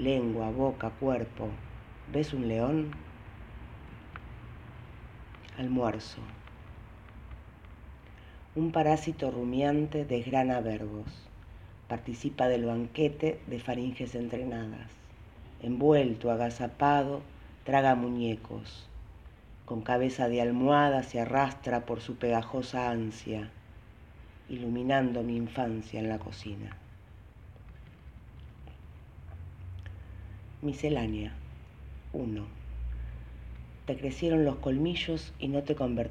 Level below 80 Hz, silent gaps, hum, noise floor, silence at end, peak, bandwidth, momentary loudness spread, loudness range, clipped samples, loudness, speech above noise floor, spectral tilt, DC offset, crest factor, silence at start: -50 dBFS; none; none; -52 dBFS; 0 s; -10 dBFS; 10 kHz; 23 LU; 10 LU; under 0.1%; -31 LUFS; 21 dB; -7 dB/octave; under 0.1%; 22 dB; 0 s